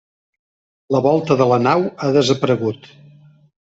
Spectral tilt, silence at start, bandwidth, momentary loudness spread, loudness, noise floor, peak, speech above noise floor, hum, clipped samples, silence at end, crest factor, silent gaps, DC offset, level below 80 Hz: -6.5 dB/octave; 0.9 s; 8 kHz; 7 LU; -17 LUFS; -47 dBFS; -2 dBFS; 31 dB; none; under 0.1%; 0.9 s; 16 dB; none; under 0.1%; -58 dBFS